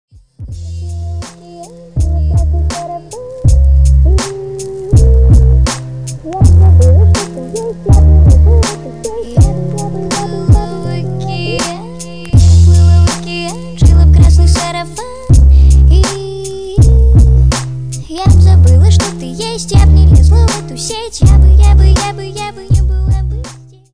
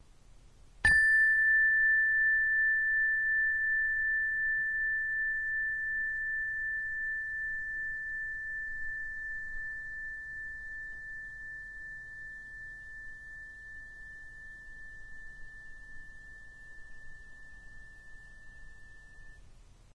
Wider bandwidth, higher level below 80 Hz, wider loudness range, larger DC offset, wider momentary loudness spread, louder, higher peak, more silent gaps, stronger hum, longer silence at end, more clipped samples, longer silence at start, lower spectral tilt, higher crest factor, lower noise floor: about the same, 10.5 kHz vs 10 kHz; first, -10 dBFS vs -54 dBFS; second, 5 LU vs 24 LU; first, 1% vs under 0.1%; second, 16 LU vs 25 LU; first, -10 LUFS vs -29 LUFS; first, 0 dBFS vs -14 dBFS; neither; neither; about the same, 0.35 s vs 0.3 s; neither; first, 0.4 s vs 0.1 s; first, -6 dB/octave vs -2 dB/octave; second, 8 dB vs 18 dB; second, -32 dBFS vs -56 dBFS